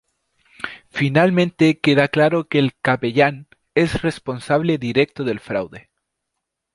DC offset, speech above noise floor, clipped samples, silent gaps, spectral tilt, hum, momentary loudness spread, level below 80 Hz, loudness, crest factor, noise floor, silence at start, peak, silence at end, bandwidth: under 0.1%; 61 dB; under 0.1%; none; -7 dB/octave; none; 13 LU; -50 dBFS; -19 LUFS; 18 dB; -79 dBFS; 0.65 s; -2 dBFS; 0.95 s; 11.5 kHz